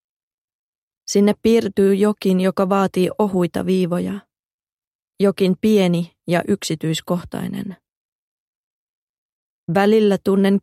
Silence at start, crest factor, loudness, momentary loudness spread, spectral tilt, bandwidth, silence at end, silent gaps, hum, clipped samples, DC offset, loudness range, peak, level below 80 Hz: 1.1 s; 16 dB; -18 LUFS; 11 LU; -6.5 dB/octave; 14.5 kHz; 0.05 s; 4.44-4.59 s, 4.72-5.08 s, 7.90-9.67 s; none; under 0.1%; under 0.1%; 7 LU; -2 dBFS; -56 dBFS